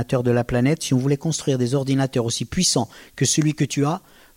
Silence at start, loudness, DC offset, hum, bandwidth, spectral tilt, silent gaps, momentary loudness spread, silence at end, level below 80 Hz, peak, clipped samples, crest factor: 0 s; -21 LUFS; under 0.1%; none; 16.5 kHz; -5 dB/octave; none; 5 LU; 0.35 s; -46 dBFS; -8 dBFS; under 0.1%; 14 dB